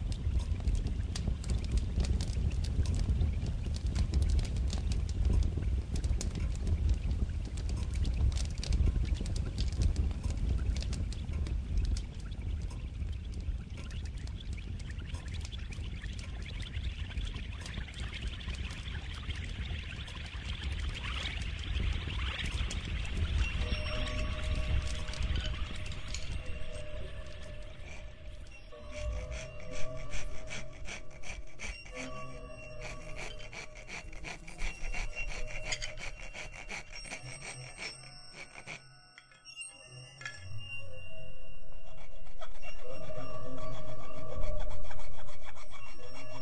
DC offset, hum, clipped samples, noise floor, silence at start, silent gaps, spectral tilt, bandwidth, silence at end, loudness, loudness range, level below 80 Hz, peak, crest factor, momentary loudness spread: under 0.1%; none; under 0.1%; -57 dBFS; 0 s; none; -5 dB/octave; 10.5 kHz; 0 s; -38 LUFS; 11 LU; -36 dBFS; -14 dBFS; 16 dB; 14 LU